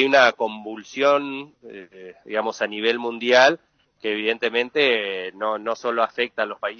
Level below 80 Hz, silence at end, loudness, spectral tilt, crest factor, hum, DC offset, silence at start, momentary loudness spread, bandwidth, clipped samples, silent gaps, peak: -74 dBFS; 0.05 s; -21 LUFS; -3 dB/octave; 22 dB; none; under 0.1%; 0 s; 17 LU; 7 kHz; under 0.1%; none; 0 dBFS